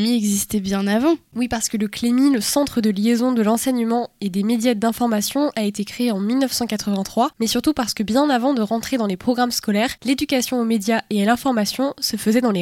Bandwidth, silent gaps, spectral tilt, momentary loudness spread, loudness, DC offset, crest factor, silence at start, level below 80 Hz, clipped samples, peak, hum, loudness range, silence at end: 17 kHz; none; -4 dB/octave; 4 LU; -20 LUFS; under 0.1%; 14 dB; 0 s; -52 dBFS; under 0.1%; -4 dBFS; none; 2 LU; 0 s